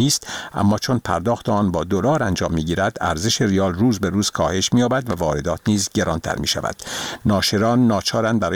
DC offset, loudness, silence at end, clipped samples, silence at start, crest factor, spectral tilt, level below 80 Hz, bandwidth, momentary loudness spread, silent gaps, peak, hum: 0.2%; -20 LUFS; 0 s; under 0.1%; 0 s; 16 dB; -4.5 dB/octave; -42 dBFS; 19.5 kHz; 5 LU; none; -4 dBFS; none